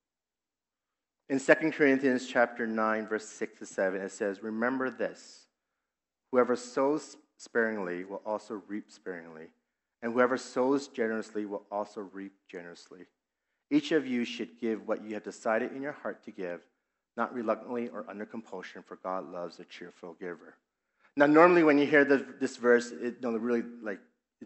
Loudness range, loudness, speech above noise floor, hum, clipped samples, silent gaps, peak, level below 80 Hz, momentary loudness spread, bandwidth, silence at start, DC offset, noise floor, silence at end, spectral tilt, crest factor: 12 LU; -30 LUFS; over 60 dB; none; under 0.1%; none; -6 dBFS; -88 dBFS; 20 LU; 8.2 kHz; 1.3 s; under 0.1%; under -90 dBFS; 0 s; -5 dB/octave; 26 dB